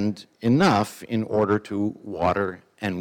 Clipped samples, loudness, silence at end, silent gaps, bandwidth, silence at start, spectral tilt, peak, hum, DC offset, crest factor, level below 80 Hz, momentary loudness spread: under 0.1%; -24 LUFS; 0 s; none; 18 kHz; 0 s; -6.5 dB/octave; -8 dBFS; none; under 0.1%; 16 dB; -56 dBFS; 10 LU